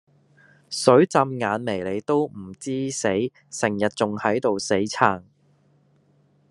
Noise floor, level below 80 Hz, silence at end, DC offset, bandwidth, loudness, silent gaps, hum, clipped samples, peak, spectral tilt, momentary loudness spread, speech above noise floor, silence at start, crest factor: -61 dBFS; -68 dBFS; 1.3 s; under 0.1%; 12 kHz; -23 LUFS; none; none; under 0.1%; 0 dBFS; -5 dB/octave; 13 LU; 39 dB; 0.7 s; 22 dB